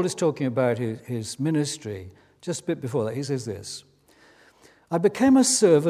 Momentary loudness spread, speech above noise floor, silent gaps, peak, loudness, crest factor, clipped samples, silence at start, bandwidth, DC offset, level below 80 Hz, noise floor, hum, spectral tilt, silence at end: 18 LU; 33 dB; none; -6 dBFS; -24 LUFS; 18 dB; under 0.1%; 0 s; 15.5 kHz; under 0.1%; -60 dBFS; -57 dBFS; none; -5 dB/octave; 0 s